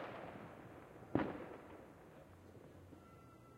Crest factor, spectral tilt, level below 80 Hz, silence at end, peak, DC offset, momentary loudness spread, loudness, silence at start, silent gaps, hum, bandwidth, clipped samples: 30 dB; -7.5 dB/octave; -72 dBFS; 0 s; -20 dBFS; under 0.1%; 19 LU; -48 LUFS; 0 s; none; none; 16 kHz; under 0.1%